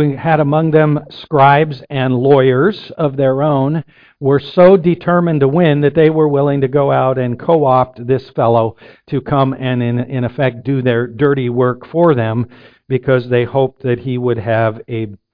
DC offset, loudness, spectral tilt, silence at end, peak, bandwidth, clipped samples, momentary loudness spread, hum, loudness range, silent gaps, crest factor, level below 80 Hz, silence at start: under 0.1%; -14 LUFS; -10.5 dB/octave; 0.2 s; 0 dBFS; 5.2 kHz; under 0.1%; 9 LU; none; 4 LU; none; 14 dB; -48 dBFS; 0 s